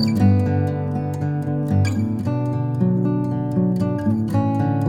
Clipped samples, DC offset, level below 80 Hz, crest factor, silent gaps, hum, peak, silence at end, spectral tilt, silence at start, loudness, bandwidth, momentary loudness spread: under 0.1%; under 0.1%; -48 dBFS; 14 dB; none; none; -6 dBFS; 0 s; -8.5 dB/octave; 0 s; -21 LUFS; 10 kHz; 6 LU